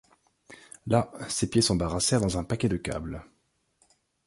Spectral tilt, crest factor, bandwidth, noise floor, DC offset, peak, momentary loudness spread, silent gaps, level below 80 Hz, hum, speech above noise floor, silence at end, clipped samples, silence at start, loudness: -4.5 dB/octave; 20 dB; 11.5 kHz; -69 dBFS; under 0.1%; -8 dBFS; 16 LU; none; -46 dBFS; none; 42 dB; 1 s; under 0.1%; 0.5 s; -27 LUFS